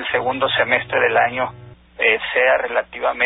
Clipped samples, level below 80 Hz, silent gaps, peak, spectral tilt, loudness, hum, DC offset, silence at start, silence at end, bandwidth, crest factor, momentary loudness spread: under 0.1%; -52 dBFS; none; -4 dBFS; -8.5 dB/octave; -18 LUFS; none; under 0.1%; 0 s; 0 s; 4 kHz; 16 dB; 7 LU